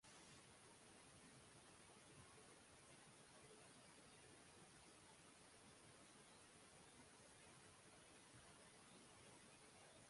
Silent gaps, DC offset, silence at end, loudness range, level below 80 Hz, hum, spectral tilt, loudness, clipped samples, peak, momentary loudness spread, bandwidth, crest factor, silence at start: none; under 0.1%; 0 s; 0 LU; -84 dBFS; none; -2.5 dB/octave; -66 LUFS; under 0.1%; -52 dBFS; 1 LU; 11.5 kHz; 14 dB; 0 s